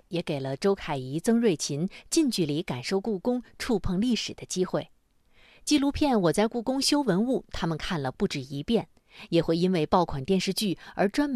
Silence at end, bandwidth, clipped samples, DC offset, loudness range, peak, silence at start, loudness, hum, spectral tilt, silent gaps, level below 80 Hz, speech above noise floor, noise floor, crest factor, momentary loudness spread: 0 s; 13.5 kHz; under 0.1%; under 0.1%; 2 LU; -10 dBFS; 0.1 s; -27 LUFS; none; -5 dB/octave; none; -48 dBFS; 34 dB; -61 dBFS; 18 dB; 8 LU